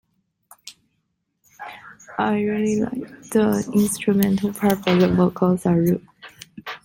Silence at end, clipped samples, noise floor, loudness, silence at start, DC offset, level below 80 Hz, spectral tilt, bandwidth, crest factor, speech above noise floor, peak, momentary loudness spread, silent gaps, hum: 0.05 s; under 0.1%; -73 dBFS; -20 LUFS; 0.65 s; under 0.1%; -52 dBFS; -6.5 dB/octave; 17 kHz; 22 dB; 54 dB; 0 dBFS; 21 LU; none; none